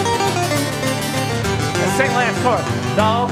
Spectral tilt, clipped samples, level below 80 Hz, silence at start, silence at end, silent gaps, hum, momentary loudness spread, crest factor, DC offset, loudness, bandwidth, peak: -4.5 dB/octave; under 0.1%; -42 dBFS; 0 s; 0 s; none; none; 4 LU; 16 dB; under 0.1%; -18 LUFS; 16 kHz; 0 dBFS